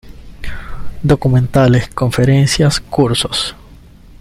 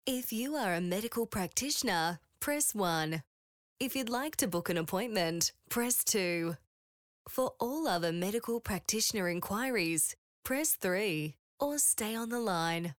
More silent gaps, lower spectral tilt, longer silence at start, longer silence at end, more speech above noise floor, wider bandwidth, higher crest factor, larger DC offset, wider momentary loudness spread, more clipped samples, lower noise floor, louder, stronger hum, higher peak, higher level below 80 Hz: second, none vs 3.27-3.76 s, 6.67-7.25 s, 10.18-10.43 s, 11.39-11.58 s; first, -5.5 dB/octave vs -3 dB/octave; about the same, 0.05 s vs 0.05 s; first, 0.45 s vs 0.05 s; second, 27 dB vs over 57 dB; second, 15.5 kHz vs over 20 kHz; about the same, 14 dB vs 18 dB; neither; first, 19 LU vs 7 LU; neither; second, -39 dBFS vs under -90 dBFS; first, -13 LUFS vs -32 LUFS; neither; first, -2 dBFS vs -16 dBFS; first, -32 dBFS vs -64 dBFS